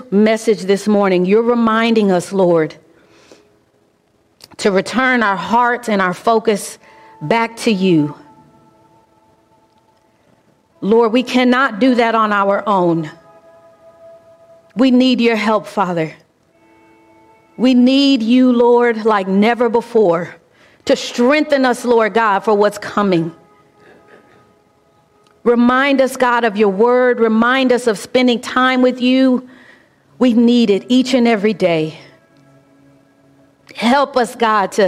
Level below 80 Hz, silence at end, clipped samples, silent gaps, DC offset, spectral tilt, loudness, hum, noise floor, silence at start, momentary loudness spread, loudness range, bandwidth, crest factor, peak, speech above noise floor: -58 dBFS; 0 s; under 0.1%; none; under 0.1%; -5.5 dB/octave; -14 LUFS; none; -58 dBFS; 0 s; 7 LU; 5 LU; 13.5 kHz; 14 dB; -2 dBFS; 44 dB